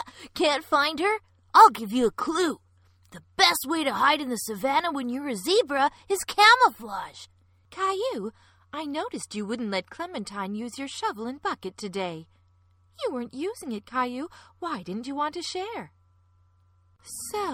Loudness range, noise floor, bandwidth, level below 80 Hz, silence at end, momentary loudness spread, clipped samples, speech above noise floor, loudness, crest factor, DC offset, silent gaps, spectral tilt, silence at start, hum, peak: 11 LU; -62 dBFS; 17 kHz; -64 dBFS; 0 s; 18 LU; under 0.1%; 36 dB; -25 LUFS; 24 dB; under 0.1%; none; -2.5 dB/octave; 0 s; none; -4 dBFS